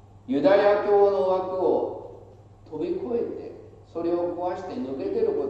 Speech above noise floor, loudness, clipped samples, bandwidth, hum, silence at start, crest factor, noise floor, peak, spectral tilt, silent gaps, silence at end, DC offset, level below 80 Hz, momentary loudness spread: 25 dB; -24 LUFS; under 0.1%; 7.2 kHz; none; 0.15 s; 18 dB; -48 dBFS; -8 dBFS; -7.5 dB/octave; none; 0 s; under 0.1%; -58 dBFS; 19 LU